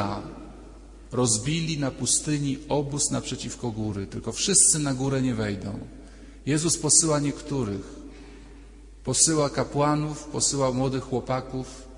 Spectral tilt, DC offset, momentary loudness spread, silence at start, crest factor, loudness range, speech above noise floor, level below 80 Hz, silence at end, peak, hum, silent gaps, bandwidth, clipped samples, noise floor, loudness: -3.5 dB/octave; under 0.1%; 18 LU; 0 s; 22 dB; 4 LU; 20 dB; -46 dBFS; 0 s; -4 dBFS; none; none; 11 kHz; under 0.1%; -46 dBFS; -24 LUFS